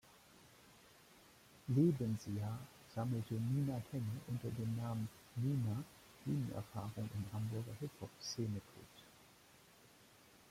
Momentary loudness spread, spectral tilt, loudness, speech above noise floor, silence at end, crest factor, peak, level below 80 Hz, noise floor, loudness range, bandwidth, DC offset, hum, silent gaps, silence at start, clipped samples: 24 LU; -7 dB/octave; -42 LUFS; 25 dB; 0.5 s; 20 dB; -22 dBFS; -72 dBFS; -65 dBFS; 7 LU; 16.5 kHz; under 0.1%; none; none; 0.1 s; under 0.1%